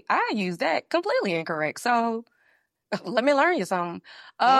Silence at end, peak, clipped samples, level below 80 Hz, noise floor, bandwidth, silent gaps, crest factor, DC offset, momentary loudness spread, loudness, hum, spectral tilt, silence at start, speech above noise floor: 0 s; -6 dBFS; under 0.1%; -78 dBFS; -67 dBFS; 14 kHz; none; 18 dB; under 0.1%; 12 LU; -25 LUFS; none; -4.5 dB/octave; 0.1 s; 43 dB